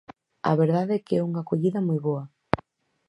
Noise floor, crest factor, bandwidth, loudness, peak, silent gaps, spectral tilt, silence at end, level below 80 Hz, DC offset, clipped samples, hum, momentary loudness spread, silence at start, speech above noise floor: -53 dBFS; 26 dB; 10.5 kHz; -26 LUFS; 0 dBFS; none; -9.5 dB/octave; 0.5 s; -56 dBFS; under 0.1%; under 0.1%; none; 8 LU; 0.45 s; 29 dB